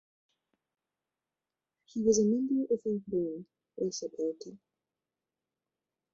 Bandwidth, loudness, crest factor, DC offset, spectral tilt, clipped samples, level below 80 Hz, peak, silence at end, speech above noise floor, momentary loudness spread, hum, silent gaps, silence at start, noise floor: 7.8 kHz; -32 LUFS; 20 dB; under 0.1%; -6.5 dB/octave; under 0.1%; -72 dBFS; -14 dBFS; 1.6 s; over 59 dB; 19 LU; none; none; 1.95 s; under -90 dBFS